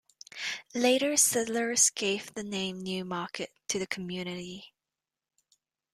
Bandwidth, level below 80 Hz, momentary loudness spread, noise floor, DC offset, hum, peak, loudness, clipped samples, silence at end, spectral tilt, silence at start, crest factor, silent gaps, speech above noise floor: 15 kHz; -72 dBFS; 14 LU; under -90 dBFS; under 0.1%; none; -8 dBFS; -29 LUFS; under 0.1%; 1.25 s; -2 dB/octave; 0.35 s; 24 dB; none; over 60 dB